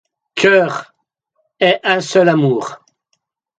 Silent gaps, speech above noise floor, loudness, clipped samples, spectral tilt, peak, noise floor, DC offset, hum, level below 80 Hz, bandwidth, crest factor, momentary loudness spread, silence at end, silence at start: none; 55 dB; -14 LUFS; under 0.1%; -5 dB/octave; 0 dBFS; -69 dBFS; under 0.1%; none; -66 dBFS; 9.2 kHz; 16 dB; 15 LU; 0.85 s; 0.35 s